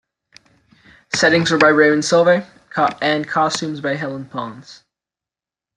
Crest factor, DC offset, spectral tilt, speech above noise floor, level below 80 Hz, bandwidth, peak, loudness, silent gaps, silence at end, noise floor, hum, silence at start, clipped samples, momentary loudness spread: 18 dB; under 0.1%; -4 dB/octave; 72 dB; -60 dBFS; 11.5 kHz; -2 dBFS; -16 LUFS; none; 1.05 s; -89 dBFS; none; 1.1 s; under 0.1%; 15 LU